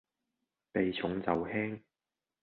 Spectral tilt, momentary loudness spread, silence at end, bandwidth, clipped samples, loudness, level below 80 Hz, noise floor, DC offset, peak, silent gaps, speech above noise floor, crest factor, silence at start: -4.5 dB/octave; 6 LU; 0.65 s; 4.5 kHz; under 0.1%; -34 LUFS; -64 dBFS; under -90 dBFS; under 0.1%; -14 dBFS; none; over 57 dB; 24 dB; 0.75 s